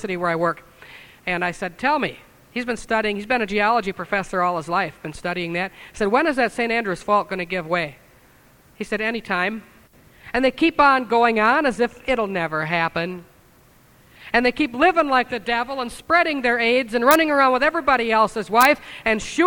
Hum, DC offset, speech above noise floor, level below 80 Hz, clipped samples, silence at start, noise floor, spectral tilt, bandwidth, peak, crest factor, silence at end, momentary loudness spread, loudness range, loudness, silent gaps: none; under 0.1%; 33 dB; -50 dBFS; under 0.1%; 0 s; -53 dBFS; -4.5 dB/octave; over 20 kHz; 0 dBFS; 22 dB; 0 s; 11 LU; 6 LU; -20 LUFS; none